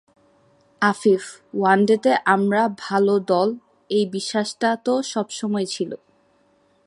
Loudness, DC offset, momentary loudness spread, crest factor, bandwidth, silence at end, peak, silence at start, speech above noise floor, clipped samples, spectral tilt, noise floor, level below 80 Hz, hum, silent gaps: -21 LUFS; under 0.1%; 9 LU; 20 dB; 11.5 kHz; 0.9 s; -2 dBFS; 0.8 s; 41 dB; under 0.1%; -5 dB/octave; -61 dBFS; -70 dBFS; none; none